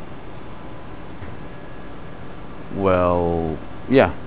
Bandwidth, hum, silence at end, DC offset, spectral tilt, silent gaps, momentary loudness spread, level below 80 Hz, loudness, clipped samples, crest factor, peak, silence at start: 4 kHz; none; 0 s; 3%; -11 dB/octave; none; 20 LU; -40 dBFS; -20 LUFS; under 0.1%; 22 dB; 0 dBFS; 0 s